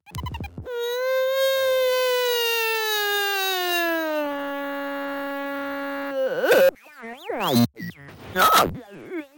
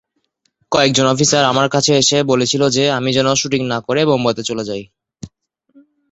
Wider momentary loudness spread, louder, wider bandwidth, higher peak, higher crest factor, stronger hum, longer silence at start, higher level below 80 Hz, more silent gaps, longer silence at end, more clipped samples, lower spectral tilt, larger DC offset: first, 17 LU vs 8 LU; second, -22 LUFS vs -15 LUFS; first, 17 kHz vs 8.2 kHz; second, -6 dBFS vs 0 dBFS; about the same, 18 dB vs 16 dB; neither; second, 0.1 s vs 0.7 s; about the same, -50 dBFS vs -52 dBFS; neither; second, 0.1 s vs 0.85 s; neither; about the same, -3.5 dB/octave vs -3.5 dB/octave; neither